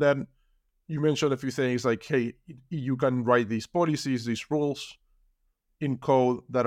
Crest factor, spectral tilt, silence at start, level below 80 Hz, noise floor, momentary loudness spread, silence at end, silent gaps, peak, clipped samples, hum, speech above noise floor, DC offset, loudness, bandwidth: 18 dB; -6 dB/octave; 0 s; -66 dBFS; -73 dBFS; 11 LU; 0 s; none; -10 dBFS; under 0.1%; none; 46 dB; under 0.1%; -27 LUFS; 15 kHz